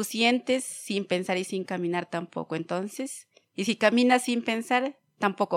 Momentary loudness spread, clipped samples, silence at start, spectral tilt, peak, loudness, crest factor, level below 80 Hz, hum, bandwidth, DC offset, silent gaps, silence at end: 12 LU; under 0.1%; 0 s; -4 dB/octave; -6 dBFS; -27 LUFS; 22 dB; -82 dBFS; none; 16 kHz; under 0.1%; none; 0 s